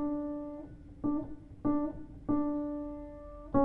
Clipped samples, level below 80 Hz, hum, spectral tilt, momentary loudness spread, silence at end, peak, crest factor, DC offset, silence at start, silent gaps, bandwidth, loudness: under 0.1%; -52 dBFS; none; -11.5 dB/octave; 14 LU; 0 s; -16 dBFS; 18 dB; under 0.1%; 0 s; none; 2.2 kHz; -36 LUFS